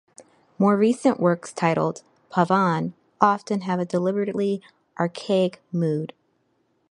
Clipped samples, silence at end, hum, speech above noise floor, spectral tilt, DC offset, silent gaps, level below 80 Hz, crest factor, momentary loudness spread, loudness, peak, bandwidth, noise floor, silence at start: under 0.1%; 0.85 s; none; 46 dB; -7 dB/octave; under 0.1%; none; -70 dBFS; 22 dB; 9 LU; -23 LUFS; -2 dBFS; 11 kHz; -68 dBFS; 0.2 s